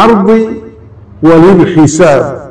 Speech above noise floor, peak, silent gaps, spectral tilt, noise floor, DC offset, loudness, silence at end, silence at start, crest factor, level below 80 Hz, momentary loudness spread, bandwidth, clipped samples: 27 dB; 0 dBFS; none; -6.5 dB/octave; -32 dBFS; under 0.1%; -6 LUFS; 0 s; 0 s; 6 dB; -36 dBFS; 9 LU; 11 kHz; 10%